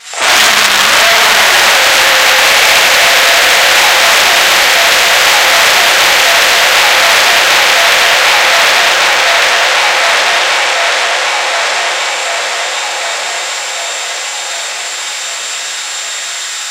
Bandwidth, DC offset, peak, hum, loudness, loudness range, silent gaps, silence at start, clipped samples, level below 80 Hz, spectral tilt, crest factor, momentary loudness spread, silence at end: over 20 kHz; under 0.1%; 0 dBFS; none; -7 LUFS; 10 LU; none; 0.05 s; 2%; -48 dBFS; 1.5 dB/octave; 10 dB; 11 LU; 0 s